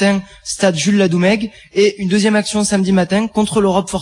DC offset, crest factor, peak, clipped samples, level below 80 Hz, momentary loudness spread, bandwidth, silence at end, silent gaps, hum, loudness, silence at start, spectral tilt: under 0.1%; 12 dB; -2 dBFS; under 0.1%; -46 dBFS; 4 LU; 11.5 kHz; 0 s; none; none; -15 LUFS; 0 s; -5 dB/octave